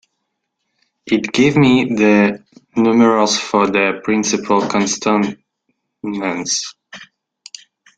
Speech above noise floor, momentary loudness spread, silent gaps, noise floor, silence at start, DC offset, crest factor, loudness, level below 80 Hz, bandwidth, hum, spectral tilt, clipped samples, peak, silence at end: 59 dB; 15 LU; none; -73 dBFS; 1.05 s; under 0.1%; 16 dB; -15 LUFS; -56 dBFS; 9.2 kHz; none; -4.5 dB/octave; under 0.1%; -2 dBFS; 0.95 s